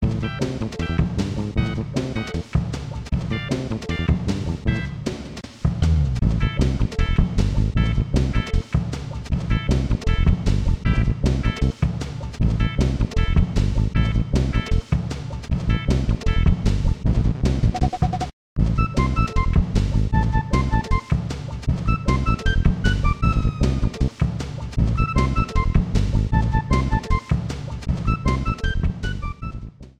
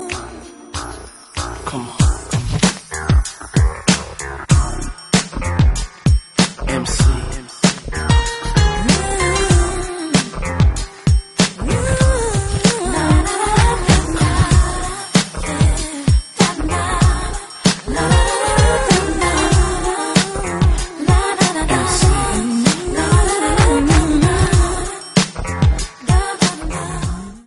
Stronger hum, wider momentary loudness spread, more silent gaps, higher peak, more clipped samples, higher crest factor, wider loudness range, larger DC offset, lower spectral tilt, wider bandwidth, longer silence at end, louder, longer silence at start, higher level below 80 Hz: neither; second, 7 LU vs 10 LU; first, 18.33-18.56 s vs none; second, -4 dBFS vs 0 dBFS; neither; about the same, 16 dB vs 16 dB; about the same, 3 LU vs 3 LU; neither; first, -7 dB/octave vs -4.5 dB/octave; second, 10 kHz vs 11.5 kHz; about the same, 0.1 s vs 0.05 s; second, -23 LUFS vs -16 LUFS; about the same, 0 s vs 0 s; about the same, -24 dBFS vs -20 dBFS